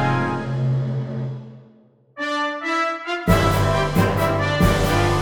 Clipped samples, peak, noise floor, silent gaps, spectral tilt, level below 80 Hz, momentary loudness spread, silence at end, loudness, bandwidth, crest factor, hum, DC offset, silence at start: under 0.1%; -4 dBFS; -53 dBFS; none; -6 dB/octave; -32 dBFS; 10 LU; 0 s; -21 LUFS; over 20 kHz; 18 dB; none; under 0.1%; 0 s